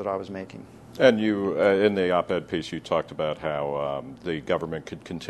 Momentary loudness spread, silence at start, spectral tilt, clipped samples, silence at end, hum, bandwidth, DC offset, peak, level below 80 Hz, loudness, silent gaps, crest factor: 16 LU; 0 s; -6 dB/octave; under 0.1%; 0 s; none; 12 kHz; under 0.1%; -2 dBFS; -58 dBFS; -25 LUFS; none; 22 dB